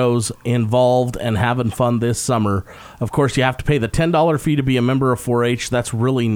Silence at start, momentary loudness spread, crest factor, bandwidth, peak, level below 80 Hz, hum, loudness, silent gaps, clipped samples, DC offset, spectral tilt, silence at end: 0 s; 5 LU; 14 dB; 16.5 kHz; -2 dBFS; -38 dBFS; none; -18 LUFS; none; under 0.1%; under 0.1%; -6 dB/octave; 0 s